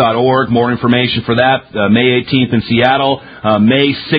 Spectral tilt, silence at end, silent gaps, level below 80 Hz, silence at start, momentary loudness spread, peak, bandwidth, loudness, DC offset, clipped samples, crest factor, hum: -9 dB/octave; 0 s; none; -42 dBFS; 0 s; 3 LU; 0 dBFS; 5 kHz; -12 LUFS; under 0.1%; under 0.1%; 12 dB; none